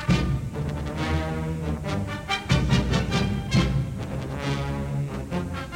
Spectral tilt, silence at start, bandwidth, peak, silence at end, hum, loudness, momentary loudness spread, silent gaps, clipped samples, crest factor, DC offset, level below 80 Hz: -6 dB/octave; 0 s; 16 kHz; -8 dBFS; 0 s; none; -26 LUFS; 7 LU; none; under 0.1%; 18 dB; under 0.1%; -34 dBFS